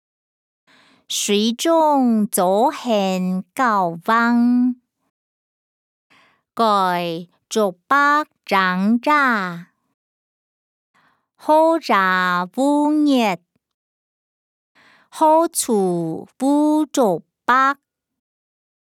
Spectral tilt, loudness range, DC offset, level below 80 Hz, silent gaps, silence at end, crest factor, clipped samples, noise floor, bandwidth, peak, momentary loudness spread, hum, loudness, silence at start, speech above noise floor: -4.5 dB/octave; 3 LU; under 0.1%; -76 dBFS; 5.10-6.10 s, 9.94-10.94 s, 13.74-14.75 s; 1.1 s; 16 dB; under 0.1%; under -90 dBFS; 17.5 kHz; -2 dBFS; 9 LU; none; -18 LUFS; 1.1 s; over 73 dB